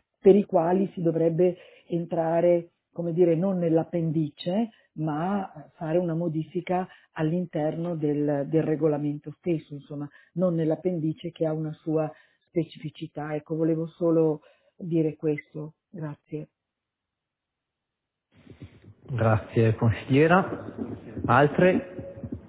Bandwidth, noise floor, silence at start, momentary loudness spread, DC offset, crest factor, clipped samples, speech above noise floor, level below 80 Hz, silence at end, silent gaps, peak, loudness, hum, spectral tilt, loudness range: 4 kHz; -86 dBFS; 0.25 s; 17 LU; under 0.1%; 20 dB; under 0.1%; 61 dB; -56 dBFS; 0 s; none; -6 dBFS; -26 LUFS; none; -12 dB/octave; 9 LU